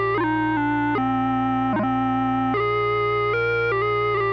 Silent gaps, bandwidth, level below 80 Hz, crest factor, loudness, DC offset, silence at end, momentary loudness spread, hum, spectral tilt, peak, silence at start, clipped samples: none; 6.2 kHz; -46 dBFS; 8 dB; -22 LUFS; under 0.1%; 0 s; 1 LU; 60 Hz at -75 dBFS; -8.5 dB/octave; -14 dBFS; 0 s; under 0.1%